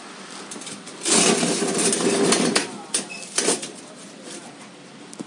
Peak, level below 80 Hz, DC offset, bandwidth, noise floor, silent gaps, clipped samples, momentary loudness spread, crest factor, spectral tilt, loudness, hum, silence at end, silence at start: -4 dBFS; -70 dBFS; under 0.1%; 11.5 kHz; -42 dBFS; none; under 0.1%; 23 LU; 20 dB; -2 dB/octave; -20 LUFS; none; 0 s; 0 s